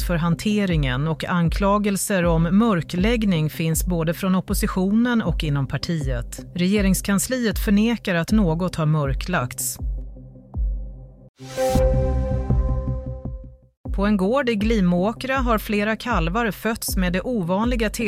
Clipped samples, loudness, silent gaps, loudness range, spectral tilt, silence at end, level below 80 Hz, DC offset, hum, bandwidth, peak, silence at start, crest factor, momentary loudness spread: under 0.1%; -22 LUFS; 11.29-11.34 s, 13.77-13.84 s; 4 LU; -5.5 dB/octave; 0 s; -30 dBFS; under 0.1%; none; 16 kHz; -8 dBFS; 0 s; 14 dB; 10 LU